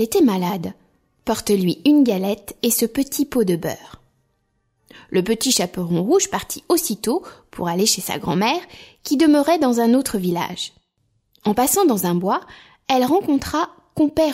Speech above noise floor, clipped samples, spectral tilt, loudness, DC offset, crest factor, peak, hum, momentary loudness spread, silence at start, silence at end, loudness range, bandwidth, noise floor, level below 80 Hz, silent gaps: 49 dB; under 0.1%; -4.5 dB/octave; -19 LUFS; under 0.1%; 16 dB; -4 dBFS; none; 10 LU; 0 s; 0 s; 3 LU; 16 kHz; -68 dBFS; -52 dBFS; none